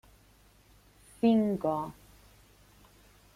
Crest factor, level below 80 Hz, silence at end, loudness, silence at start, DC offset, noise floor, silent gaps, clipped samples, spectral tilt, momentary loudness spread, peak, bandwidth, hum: 20 dB; -62 dBFS; 1.45 s; -29 LUFS; 1.25 s; under 0.1%; -61 dBFS; none; under 0.1%; -7.5 dB/octave; 11 LU; -14 dBFS; 15 kHz; 50 Hz at -55 dBFS